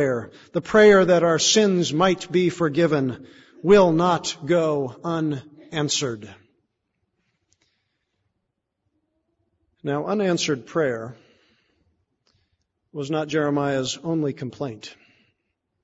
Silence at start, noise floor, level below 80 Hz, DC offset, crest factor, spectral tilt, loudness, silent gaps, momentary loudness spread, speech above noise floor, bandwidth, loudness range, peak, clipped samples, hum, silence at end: 0 s; -78 dBFS; -58 dBFS; under 0.1%; 20 dB; -4.5 dB/octave; -21 LUFS; none; 17 LU; 57 dB; 8 kHz; 12 LU; -4 dBFS; under 0.1%; none; 0.9 s